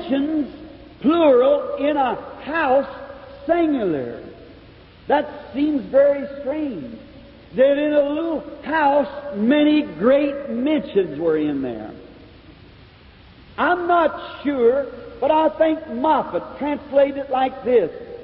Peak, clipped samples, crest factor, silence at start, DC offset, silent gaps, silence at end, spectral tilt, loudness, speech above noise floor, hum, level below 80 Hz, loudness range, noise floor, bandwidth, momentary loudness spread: -6 dBFS; under 0.1%; 14 dB; 0 s; under 0.1%; none; 0 s; -10.5 dB/octave; -20 LUFS; 27 dB; none; -52 dBFS; 4 LU; -46 dBFS; 5.4 kHz; 14 LU